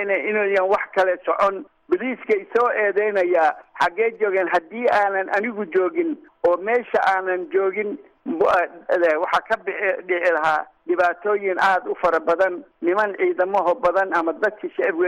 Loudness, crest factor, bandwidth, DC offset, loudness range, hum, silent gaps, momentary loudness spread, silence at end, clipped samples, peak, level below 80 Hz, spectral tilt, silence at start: -21 LUFS; 12 dB; 11 kHz; under 0.1%; 1 LU; none; none; 5 LU; 0 s; under 0.1%; -8 dBFS; -62 dBFS; -5 dB/octave; 0 s